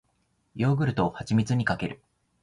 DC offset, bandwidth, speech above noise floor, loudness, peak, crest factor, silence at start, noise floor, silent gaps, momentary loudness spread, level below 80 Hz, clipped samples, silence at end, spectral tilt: under 0.1%; 11 kHz; 46 dB; -27 LUFS; -12 dBFS; 16 dB; 0.55 s; -71 dBFS; none; 14 LU; -54 dBFS; under 0.1%; 0.45 s; -7 dB/octave